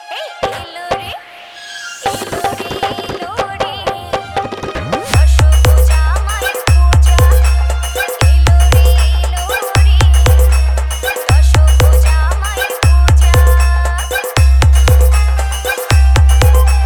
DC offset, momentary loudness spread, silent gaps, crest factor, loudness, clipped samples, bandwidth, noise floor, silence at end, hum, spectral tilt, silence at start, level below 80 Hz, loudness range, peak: under 0.1%; 11 LU; none; 10 dB; -12 LUFS; under 0.1%; 20 kHz; -33 dBFS; 0 s; none; -4.5 dB/octave; 0 s; -12 dBFS; 9 LU; 0 dBFS